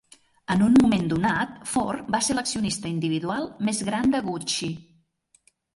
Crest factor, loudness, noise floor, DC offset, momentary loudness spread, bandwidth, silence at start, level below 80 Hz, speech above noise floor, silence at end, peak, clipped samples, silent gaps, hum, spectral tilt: 18 dB; -24 LUFS; -64 dBFS; under 0.1%; 9 LU; 11.5 kHz; 0.5 s; -54 dBFS; 41 dB; 0.95 s; -8 dBFS; under 0.1%; none; none; -4.5 dB/octave